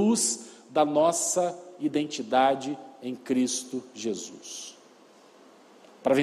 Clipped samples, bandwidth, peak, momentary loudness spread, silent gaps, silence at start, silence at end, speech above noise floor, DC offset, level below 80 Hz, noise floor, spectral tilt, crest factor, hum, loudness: under 0.1%; 15 kHz; -10 dBFS; 15 LU; none; 0 s; 0 s; 28 dB; under 0.1%; -74 dBFS; -55 dBFS; -3.5 dB/octave; 18 dB; none; -27 LUFS